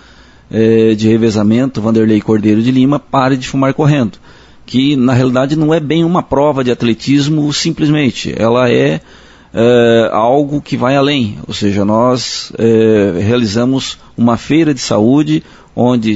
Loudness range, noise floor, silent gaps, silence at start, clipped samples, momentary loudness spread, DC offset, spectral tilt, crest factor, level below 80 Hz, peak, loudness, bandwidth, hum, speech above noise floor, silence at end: 1 LU; -40 dBFS; none; 0.55 s; under 0.1%; 6 LU; under 0.1%; -6.5 dB/octave; 12 dB; -42 dBFS; 0 dBFS; -12 LUFS; 8 kHz; none; 30 dB; 0 s